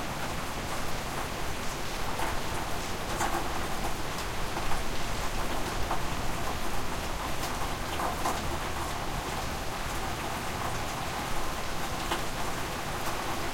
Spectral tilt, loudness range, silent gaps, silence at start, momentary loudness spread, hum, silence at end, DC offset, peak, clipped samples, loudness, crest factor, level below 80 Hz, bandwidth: -3.5 dB/octave; 1 LU; none; 0 s; 3 LU; none; 0 s; under 0.1%; -14 dBFS; under 0.1%; -33 LUFS; 16 dB; -40 dBFS; 16.5 kHz